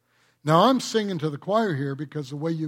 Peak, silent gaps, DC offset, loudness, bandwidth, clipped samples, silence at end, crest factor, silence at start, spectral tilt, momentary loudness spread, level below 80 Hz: -6 dBFS; none; under 0.1%; -24 LUFS; 16 kHz; under 0.1%; 0 s; 20 dB; 0.45 s; -6 dB/octave; 14 LU; -70 dBFS